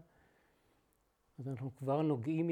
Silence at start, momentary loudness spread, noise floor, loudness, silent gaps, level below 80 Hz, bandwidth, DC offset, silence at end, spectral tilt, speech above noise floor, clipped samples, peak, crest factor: 1.4 s; 11 LU; -76 dBFS; -37 LUFS; none; -80 dBFS; 9.6 kHz; under 0.1%; 0 s; -9.5 dB/octave; 41 dB; under 0.1%; -22 dBFS; 16 dB